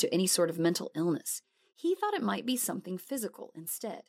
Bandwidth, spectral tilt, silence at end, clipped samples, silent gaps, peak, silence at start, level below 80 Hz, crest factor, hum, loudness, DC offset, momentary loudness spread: 16 kHz; -4 dB/octave; 0.05 s; under 0.1%; none; -14 dBFS; 0 s; -84 dBFS; 18 dB; none; -32 LUFS; under 0.1%; 11 LU